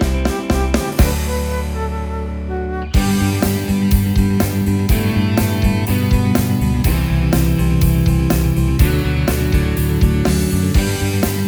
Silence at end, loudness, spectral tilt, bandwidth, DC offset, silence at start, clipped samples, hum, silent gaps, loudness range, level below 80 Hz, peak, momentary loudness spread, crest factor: 0 s; -17 LUFS; -6 dB/octave; over 20 kHz; under 0.1%; 0 s; under 0.1%; none; none; 3 LU; -20 dBFS; 0 dBFS; 6 LU; 16 dB